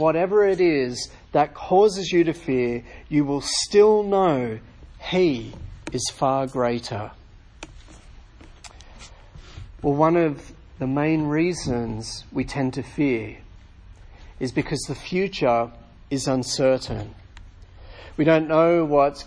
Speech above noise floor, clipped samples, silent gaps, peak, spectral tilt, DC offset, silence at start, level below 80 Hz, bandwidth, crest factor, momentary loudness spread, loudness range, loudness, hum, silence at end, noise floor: 24 dB; under 0.1%; none; -4 dBFS; -5.5 dB/octave; under 0.1%; 0 s; -46 dBFS; 10.5 kHz; 20 dB; 15 LU; 8 LU; -22 LUFS; none; 0 s; -46 dBFS